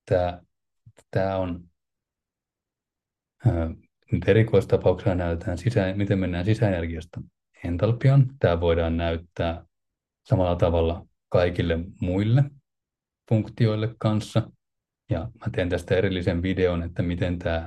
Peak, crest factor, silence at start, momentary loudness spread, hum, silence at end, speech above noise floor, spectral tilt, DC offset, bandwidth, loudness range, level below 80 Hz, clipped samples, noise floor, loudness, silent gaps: -6 dBFS; 18 dB; 0.05 s; 11 LU; none; 0 s; 65 dB; -8 dB/octave; under 0.1%; 10 kHz; 4 LU; -46 dBFS; under 0.1%; -88 dBFS; -25 LUFS; none